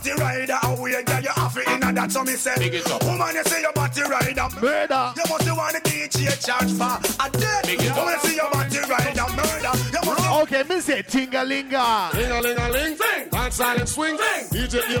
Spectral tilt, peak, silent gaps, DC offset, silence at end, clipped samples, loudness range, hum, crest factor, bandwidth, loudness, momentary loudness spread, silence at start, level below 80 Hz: -3.5 dB/octave; -8 dBFS; none; under 0.1%; 0 s; under 0.1%; 1 LU; none; 14 dB; 19.5 kHz; -22 LUFS; 2 LU; 0 s; -40 dBFS